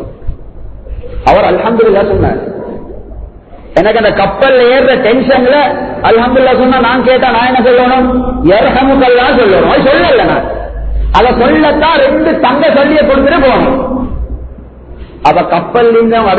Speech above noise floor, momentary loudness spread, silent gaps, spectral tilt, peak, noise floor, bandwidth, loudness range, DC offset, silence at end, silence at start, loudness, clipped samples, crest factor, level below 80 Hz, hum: 22 dB; 13 LU; none; -7.5 dB/octave; 0 dBFS; -29 dBFS; 6.8 kHz; 3 LU; under 0.1%; 0 s; 0 s; -8 LUFS; 0.3%; 8 dB; -24 dBFS; none